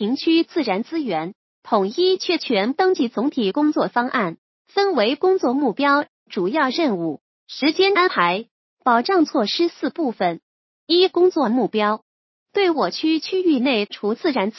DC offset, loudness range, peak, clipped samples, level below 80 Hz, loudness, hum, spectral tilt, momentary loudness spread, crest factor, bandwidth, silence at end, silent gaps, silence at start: under 0.1%; 1 LU; -2 dBFS; under 0.1%; -76 dBFS; -20 LUFS; none; -5.5 dB/octave; 8 LU; 18 dB; 6.2 kHz; 0 s; 1.35-1.62 s, 4.38-4.65 s, 6.08-6.26 s, 7.21-7.46 s, 8.51-8.77 s, 10.42-10.87 s, 12.02-12.46 s; 0 s